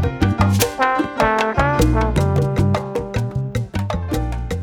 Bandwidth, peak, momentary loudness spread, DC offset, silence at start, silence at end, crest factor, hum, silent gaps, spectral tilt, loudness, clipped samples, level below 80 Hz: over 20 kHz; 0 dBFS; 7 LU; under 0.1%; 0 s; 0 s; 18 dB; none; none; -6 dB/octave; -19 LUFS; under 0.1%; -28 dBFS